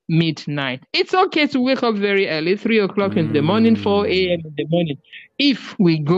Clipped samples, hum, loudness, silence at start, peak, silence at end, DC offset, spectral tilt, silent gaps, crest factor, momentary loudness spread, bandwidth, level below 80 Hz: under 0.1%; none; -18 LUFS; 0.1 s; -6 dBFS; 0 s; under 0.1%; -7 dB/octave; none; 12 dB; 8 LU; 7.8 kHz; -58 dBFS